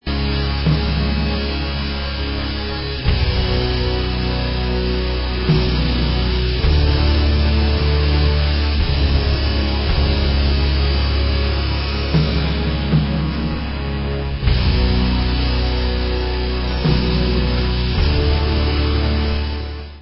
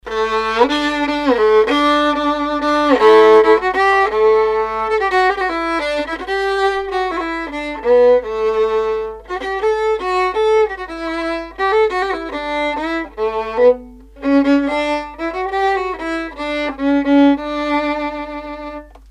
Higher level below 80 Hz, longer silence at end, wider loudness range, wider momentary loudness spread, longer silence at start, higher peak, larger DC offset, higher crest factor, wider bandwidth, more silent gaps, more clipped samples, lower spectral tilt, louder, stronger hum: first, -20 dBFS vs -42 dBFS; second, 0 s vs 0.25 s; second, 3 LU vs 6 LU; second, 6 LU vs 11 LU; about the same, 0.05 s vs 0.05 s; about the same, -2 dBFS vs 0 dBFS; neither; about the same, 14 dB vs 16 dB; second, 5.8 kHz vs 10.5 kHz; neither; neither; first, -10.5 dB/octave vs -4.5 dB/octave; second, -19 LUFS vs -16 LUFS; neither